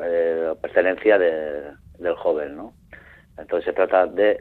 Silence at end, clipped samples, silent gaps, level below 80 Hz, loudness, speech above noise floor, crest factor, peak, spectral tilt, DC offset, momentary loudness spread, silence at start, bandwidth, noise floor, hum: 0 s; under 0.1%; none; -54 dBFS; -21 LUFS; 26 dB; 18 dB; -4 dBFS; -7 dB/octave; under 0.1%; 18 LU; 0 s; 4.3 kHz; -47 dBFS; none